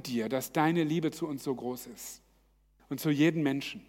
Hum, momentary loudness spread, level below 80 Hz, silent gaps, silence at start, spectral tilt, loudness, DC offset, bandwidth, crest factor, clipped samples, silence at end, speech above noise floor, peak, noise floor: none; 16 LU; -68 dBFS; none; 0 s; -5.5 dB/octave; -31 LUFS; under 0.1%; 17 kHz; 20 dB; under 0.1%; 0.05 s; 36 dB; -12 dBFS; -67 dBFS